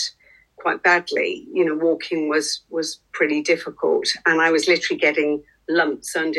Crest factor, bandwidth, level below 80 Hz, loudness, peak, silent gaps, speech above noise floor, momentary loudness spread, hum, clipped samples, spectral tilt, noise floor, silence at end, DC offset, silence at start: 18 dB; 12.5 kHz; -66 dBFS; -20 LUFS; -2 dBFS; none; 31 dB; 9 LU; none; under 0.1%; -2.5 dB/octave; -52 dBFS; 0 s; under 0.1%; 0 s